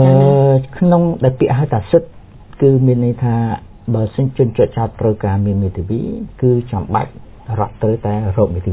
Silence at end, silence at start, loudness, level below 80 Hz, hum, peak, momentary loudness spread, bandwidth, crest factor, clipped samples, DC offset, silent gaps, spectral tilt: 0 s; 0 s; -15 LUFS; -34 dBFS; none; 0 dBFS; 9 LU; 4 kHz; 14 dB; under 0.1%; under 0.1%; none; -13.5 dB/octave